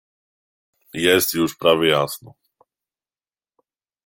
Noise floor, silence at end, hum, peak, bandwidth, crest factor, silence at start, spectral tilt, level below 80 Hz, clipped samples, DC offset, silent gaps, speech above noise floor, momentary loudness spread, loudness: under -90 dBFS; 1.75 s; none; -2 dBFS; 17 kHz; 22 dB; 0.95 s; -3.5 dB/octave; -62 dBFS; under 0.1%; under 0.1%; none; over 71 dB; 14 LU; -18 LUFS